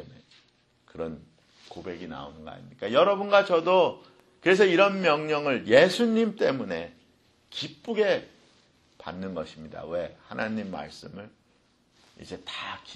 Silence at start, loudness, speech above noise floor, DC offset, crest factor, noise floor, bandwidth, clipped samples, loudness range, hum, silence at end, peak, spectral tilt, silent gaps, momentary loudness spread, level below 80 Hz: 0 s; -25 LUFS; 40 dB; under 0.1%; 22 dB; -66 dBFS; 12 kHz; under 0.1%; 14 LU; none; 0 s; -6 dBFS; -5 dB/octave; none; 23 LU; -64 dBFS